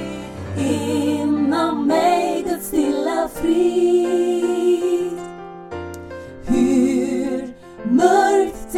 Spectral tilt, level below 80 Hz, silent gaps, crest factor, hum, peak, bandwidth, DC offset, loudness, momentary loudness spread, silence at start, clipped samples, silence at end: -5.5 dB/octave; -46 dBFS; none; 18 dB; none; 0 dBFS; 16 kHz; under 0.1%; -19 LUFS; 16 LU; 0 s; under 0.1%; 0 s